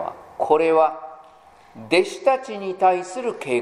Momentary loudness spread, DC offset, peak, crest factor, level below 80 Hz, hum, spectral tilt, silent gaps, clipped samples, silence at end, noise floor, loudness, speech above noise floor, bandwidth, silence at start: 13 LU; under 0.1%; -4 dBFS; 18 dB; -64 dBFS; none; -4.5 dB/octave; none; under 0.1%; 0 s; -49 dBFS; -21 LUFS; 29 dB; 11.5 kHz; 0 s